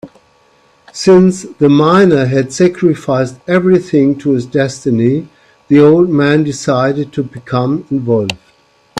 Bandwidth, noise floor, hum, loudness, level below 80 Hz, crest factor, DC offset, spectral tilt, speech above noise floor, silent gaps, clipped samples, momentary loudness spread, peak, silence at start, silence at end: 11 kHz; -50 dBFS; none; -12 LUFS; -50 dBFS; 12 dB; under 0.1%; -6.5 dB/octave; 40 dB; none; under 0.1%; 9 LU; 0 dBFS; 0.05 s; 0 s